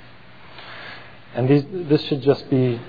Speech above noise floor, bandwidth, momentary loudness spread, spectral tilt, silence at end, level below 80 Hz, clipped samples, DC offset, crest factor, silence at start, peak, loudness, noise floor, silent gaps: 26 dB; 5 kHz; 19 LU; -9.5 dB/octave; 0 s; -58 dBFS; under 0.1%; 0.6%; 18 dB; 0.55 s; -4 dBFS; -20 LUFS; -46 dBFS; none